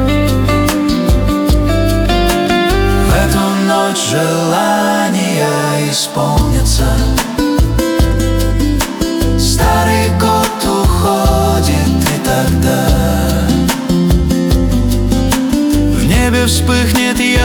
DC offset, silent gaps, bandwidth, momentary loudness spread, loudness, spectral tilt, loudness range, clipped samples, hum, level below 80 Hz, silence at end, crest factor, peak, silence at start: under 0.1%; none; over 20 kHz; 2 LU; -12 LUFS; -5 dB/octave; 1 LU; under 0.1%; none; -18 dBFS; 0 s; 12 dB; 0 dBFS; 0 s